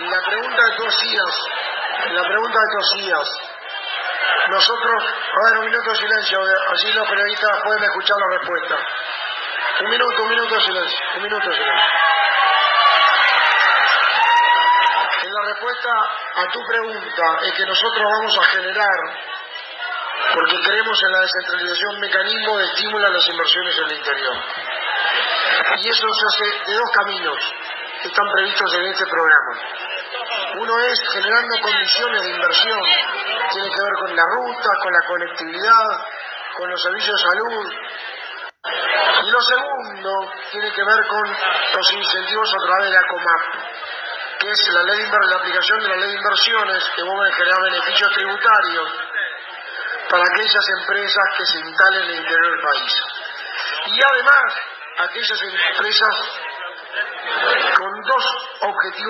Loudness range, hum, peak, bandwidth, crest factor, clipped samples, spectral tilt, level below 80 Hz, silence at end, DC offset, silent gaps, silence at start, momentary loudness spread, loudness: 4 LU; none; 0 dBFS; 7 kHz; 18 dB; under 0.1%; -1.5 dB/octave; -74 dBFS; 0 s; under 0.1%; none; 0 s; 11 LU; -17 LUFS